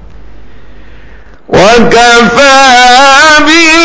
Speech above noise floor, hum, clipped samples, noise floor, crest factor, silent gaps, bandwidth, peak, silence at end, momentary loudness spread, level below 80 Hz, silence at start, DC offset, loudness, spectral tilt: 30 dB; none; 10%; -33 dBFS; 4 dB; none; 8 kHz; 0 dBFS; 0 s; 3 LU; -30 dBFS; 1.5 s; 6%; -2 LUFS; -2.5 dB/octave